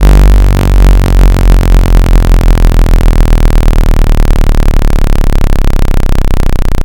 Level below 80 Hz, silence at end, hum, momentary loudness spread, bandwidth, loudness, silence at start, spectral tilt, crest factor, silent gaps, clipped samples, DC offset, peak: -4 dBFS; 0 s; none; 5 LU; 17 kHz; -10 LUFS; 0 s; -6.5 dB/octave; 4 dB; none; 20%; under 0.1%; 0 dBFS